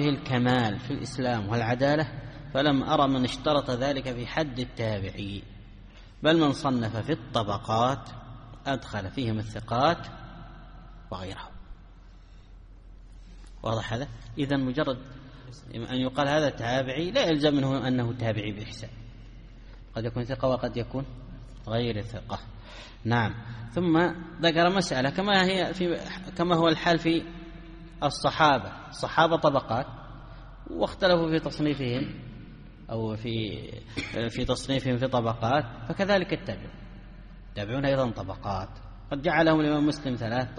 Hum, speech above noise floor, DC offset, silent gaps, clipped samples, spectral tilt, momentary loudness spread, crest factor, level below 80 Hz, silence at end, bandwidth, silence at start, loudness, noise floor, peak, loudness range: none; 22 dB; under 0.1%; none; under 0.1%; -6 dB/octave; 21 LU; 22 dB; -48 dBFS; 0 s; 10 kHz; 0 s; -27 LUFS; -49 dBFS; -6 dBFS; 7 LU